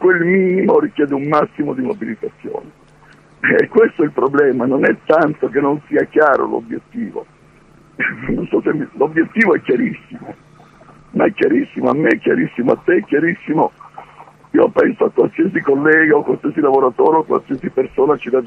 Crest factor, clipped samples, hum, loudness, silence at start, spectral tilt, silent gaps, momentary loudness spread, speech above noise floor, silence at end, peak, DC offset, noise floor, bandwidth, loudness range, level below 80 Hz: 16 dB; under 0.1%; none; -15 LUFS; 0 s; -8.5 dB/octave; none; 12 LU; 32 dB; 0 s; 0 dBFS; under 0.1%; -47 dBFS; 6.4 kHz; 4 LU; -52 dBFS